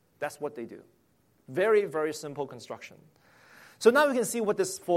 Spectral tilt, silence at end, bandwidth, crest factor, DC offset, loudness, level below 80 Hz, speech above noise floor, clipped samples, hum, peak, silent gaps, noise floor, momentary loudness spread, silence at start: -4 dB/octave; 0 s; 16 kHz; 22 dB; under 0.1%; -28 LUFS; -76 dBFS; 28 dB; under 0.1%; none; -8 dBFS; none; -56 dBFS; 19 LU; 0.2 s